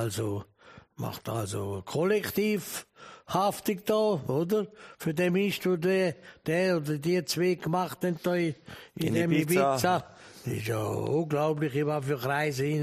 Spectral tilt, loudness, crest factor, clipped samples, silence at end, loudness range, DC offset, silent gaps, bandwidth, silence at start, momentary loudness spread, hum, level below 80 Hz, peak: -5.5 dB/octave; -29 LUFS; 18 dB; under 0.1%; 0 s; 2 LU; under 0.1%; none; 15.5 kHz; 0 s; 12 LU; none; -64 dBFS; -10 dBFS